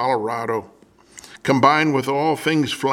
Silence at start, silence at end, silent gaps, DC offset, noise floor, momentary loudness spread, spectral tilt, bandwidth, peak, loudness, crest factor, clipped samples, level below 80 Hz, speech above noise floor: 0 s; 0 s; none; under 0.1%; -45 dBFS; 11 LU; -5.5 dB/octave; 16.5 kHz; 0 dBFS; -19 LUFS; 20 dB; under 0.1%; -62 dBFS; 27 dB